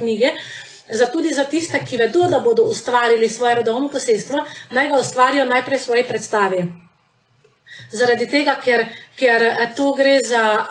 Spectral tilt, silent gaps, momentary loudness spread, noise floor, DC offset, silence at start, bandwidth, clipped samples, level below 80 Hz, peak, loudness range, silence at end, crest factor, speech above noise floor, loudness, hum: -3.5 dB/octave; none; 8 LU; -59 dBFS; under 0.1%; 0 s; 10.5 kHz; under 0.1%; -66 dBFS; -4 dBFS; 3 LU; 0 s; 14 dB; 42 dB; -17 LUFS; none